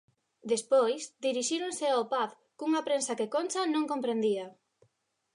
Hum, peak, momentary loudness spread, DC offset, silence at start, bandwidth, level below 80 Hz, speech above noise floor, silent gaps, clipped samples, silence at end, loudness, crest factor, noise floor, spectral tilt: none; -16 dBFS; 8 LU; under 0.1%; 0.45 s; 11.5 kHz; -86 dBFS; 46 dB; none; under 0.1%; 0.85 s; -30 LUFS; 16 dB; -75 dBFS; -3 dB/octave